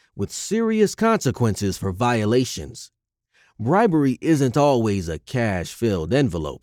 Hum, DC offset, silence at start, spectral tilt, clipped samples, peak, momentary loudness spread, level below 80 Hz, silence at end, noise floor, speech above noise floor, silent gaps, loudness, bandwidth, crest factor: none; under 0.1%; 0.15 s; -6 dB/octave; under 0.1%; -6 dBFS; 10 LU; -48 dBFS; 0.05 s; -63 dBFS; 43 dB; none; -21 LUFS; 17.5 kHz; 16 dB